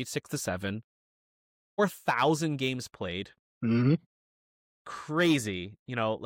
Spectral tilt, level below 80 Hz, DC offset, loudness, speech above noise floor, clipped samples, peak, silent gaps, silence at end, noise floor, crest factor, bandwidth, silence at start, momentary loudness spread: -5.5 dB/octave; -66 dBFS; under 0.1%; -30 LUFS; over 61 dB; under 0.1%; -14 dBFS; 0.84-1.77 s, 3.39-3.61 s, 4.06-4.85 s, 5.79-5.86 s; 0 s; under -90 dBFS; 16 dB; 17 kHz; 0 s; 13 LU